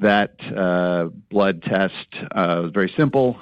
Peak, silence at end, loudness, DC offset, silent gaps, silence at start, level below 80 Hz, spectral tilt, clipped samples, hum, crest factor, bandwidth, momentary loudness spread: -6 dBFS; 0 s; -21 LUFS; under 0.1%; none; 0 s; -54 dBFS; -8.5 dB/octave; under 0.1%; none; 14 dB; 5.6 kHz; 6 LU